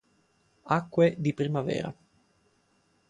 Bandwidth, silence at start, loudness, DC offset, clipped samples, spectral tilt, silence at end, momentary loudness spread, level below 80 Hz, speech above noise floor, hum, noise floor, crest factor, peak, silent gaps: 9.8 kHz; 0.65 s; -28 LUFS; under 0.1%; under 0.1%; -7.5 dB/octave; 1.15 s; 9 LU; -66 dBFS; 42 dB; none; -69 dBFS; 20 dB; -10 dBFS; none